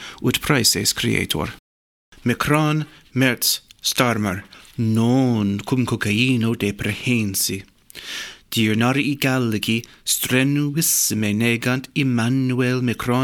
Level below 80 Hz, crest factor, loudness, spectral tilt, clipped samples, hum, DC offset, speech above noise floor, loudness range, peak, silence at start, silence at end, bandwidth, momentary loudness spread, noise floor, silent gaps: -50 dBFS; 18 dB; -20 LUFS; -4 dB/octave; under 0.1%; none; under 0.1%; over 70 dB; 2 LU; -4 dBFS; 0 s; 0 s; 19 kHz; 8 LU; under -90 dBFS; 1.59-2.12 s